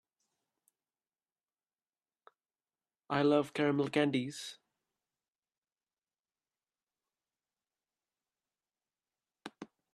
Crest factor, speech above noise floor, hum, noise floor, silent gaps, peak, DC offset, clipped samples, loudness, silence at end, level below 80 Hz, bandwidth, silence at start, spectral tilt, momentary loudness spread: 24 dB; over 58 dB; none; under -90 dBFS; 5.38-5.43 s, 5.58-5.62 s; -16 dBFS; under 0.1%; under 0.1%; -32 LUFS; 0.3 s; -82 dBFS; 12.5 kHz; 3.1 s; -6 dB/octave; 23 LU